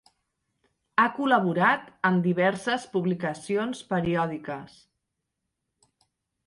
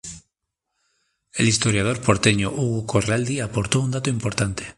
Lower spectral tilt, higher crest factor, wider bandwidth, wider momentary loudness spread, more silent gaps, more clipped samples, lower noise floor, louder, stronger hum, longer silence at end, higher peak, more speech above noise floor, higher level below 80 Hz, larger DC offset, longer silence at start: first, -6.5 dB/octave vs -4.5 dB/octave; about the same, 22 dB vs 22 dB; about the same, 11.5 kHz vs 11.5 kHz; about the same, 8 LU vs 6 LU; neither; neither; about the same, -82 dBFS vs -80 dBFS; second, -26 LUFS vs -21 LUFS; neither; first, 1.8 s vs 0.05 s; second, -6 dBFS vs -2 dBFS; about the same, 57 dB vs 59 dB; second, -64 dBFS vs -46 dBFS; neither; first, 0.95 s vs 0.05 s